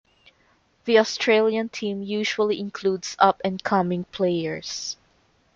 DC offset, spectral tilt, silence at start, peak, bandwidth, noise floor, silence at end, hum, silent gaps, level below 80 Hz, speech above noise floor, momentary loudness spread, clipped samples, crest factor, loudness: under 0.1%; -4.5 dB/octave; 0.85 s; -2 dBFS; 7.6 kHz; -63 dBFS; 0.6 s; none; none; -64 dBFS; 40 dB; 10 LU; under 0.1%; 22 dB; -23 LUFS